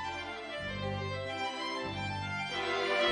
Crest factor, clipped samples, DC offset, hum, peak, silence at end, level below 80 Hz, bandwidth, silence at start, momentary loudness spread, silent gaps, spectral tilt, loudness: 18 dB; under 0.1%; under 0.1%; none; -16 dBFS; 0 s; -60 dBFS; 10 kHz; 0 s; 7 LU; none; -4.5 dB/octave; -35 LUFS